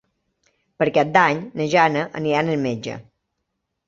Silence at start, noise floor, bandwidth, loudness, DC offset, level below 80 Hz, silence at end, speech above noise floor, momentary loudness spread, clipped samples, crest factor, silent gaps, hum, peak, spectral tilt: 0.8 s; -77 dBFS; 7.8 kHz; -20 LUFS; under 0.1%; -62 dBFS; 0.85 s; 58 dB; 11 LU; under 0.1%; 20 dB; none; none; -2 dBFS; -6 dB/octave